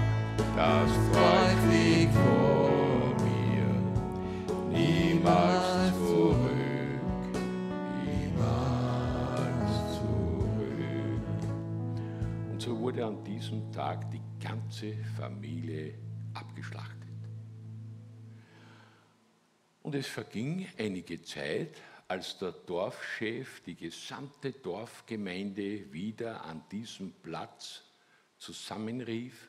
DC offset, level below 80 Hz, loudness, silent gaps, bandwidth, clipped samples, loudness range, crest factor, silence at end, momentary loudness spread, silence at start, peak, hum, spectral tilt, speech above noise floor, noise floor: under 0.1%; -48 dBFS; -31 LUFS; none; 14 kHz; under 0.1%; 16 LU; 20 dB; 0.05 s; 19 LU; 0 s; -10 dBFS; none; -6.5 dB/octave; 38 dB; -69 dBFS